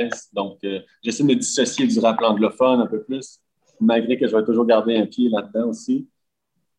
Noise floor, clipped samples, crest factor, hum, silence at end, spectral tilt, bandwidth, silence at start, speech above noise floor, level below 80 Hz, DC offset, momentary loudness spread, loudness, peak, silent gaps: -76 dBFS; under 0.1%; 16 dB; none; 0.75 s; -4.5 dB/octave; 11 kHz; 0 s; 56 dB; -68 dBFS; under 0.1%; 11 LU; -20 LUFS; -4 dBFS; none